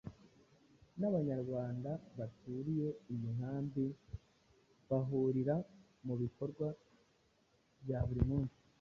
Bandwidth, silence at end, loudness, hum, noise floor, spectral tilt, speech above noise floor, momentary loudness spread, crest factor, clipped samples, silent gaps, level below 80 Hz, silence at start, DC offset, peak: 6.8 kHz; 0.3 s; -40 LUFS; none; -74 dBFS; -10.5 dB/octave; 36 dB; 16 LU; 20 dB; under 0.1%; none; -56 dBFS; 0.05 s; under 0.1%; -20 dBFS